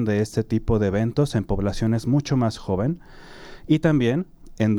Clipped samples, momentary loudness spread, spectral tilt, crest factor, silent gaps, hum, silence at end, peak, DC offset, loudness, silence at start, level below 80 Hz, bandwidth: under 0.1%; 8 LU; -7.5 dB/octave; 16 dB; none; none; 0 s; -6 dBFS; under 0.1%; -23 LUFS; 0 s; -38 dBFS; 12.5 kHz